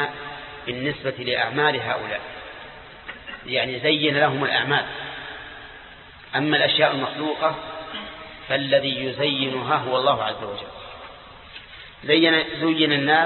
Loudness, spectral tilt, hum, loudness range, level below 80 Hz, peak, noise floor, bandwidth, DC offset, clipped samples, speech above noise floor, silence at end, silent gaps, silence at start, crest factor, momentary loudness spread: -22 LUFS; -9.5 dB/octave; none; 3 LU; -56 dBFS; -4 dBFS; -44 dBFS; 4.4 kHz; under 0.1%; under 0.1%; 22 dB; 0 s; none; 0 s; 20 dB; 21 LU